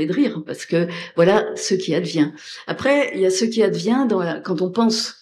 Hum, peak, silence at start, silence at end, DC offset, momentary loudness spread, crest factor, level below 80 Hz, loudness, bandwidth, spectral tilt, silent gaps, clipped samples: none; -2 dBFS; 0 s; 0.1 s; under 0.1%; 6 LU; 16 dB; -64 dBFS; -20 LUFS; 13 kHz; -5 dB/octave; none; under 0.1%